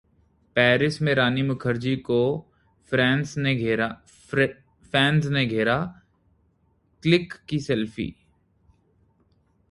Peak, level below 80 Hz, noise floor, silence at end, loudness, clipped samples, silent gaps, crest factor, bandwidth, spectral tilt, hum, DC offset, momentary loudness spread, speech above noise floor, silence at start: -4 dBFS; -54 dBFS; -65 dBFS; 1.6 s; -24 LUFS; under 0.1%; none; 22 dB; 11.5 kHz; -6.5 dB/octave; none; under 0.1%; 10 LU; 43 dB; 0.55 s